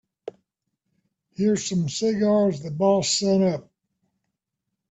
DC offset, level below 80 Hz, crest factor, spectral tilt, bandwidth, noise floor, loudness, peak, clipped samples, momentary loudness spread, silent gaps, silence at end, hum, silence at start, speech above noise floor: under 0.1%; -64 dBFS; 16 dB; -5 dB/octave; 9 kHz; -82 dBFS; -22 LUFS; -8 dBFS; under 0.1%; 21 LU; none; 1.3 s; none; 0.25 s; 61 dB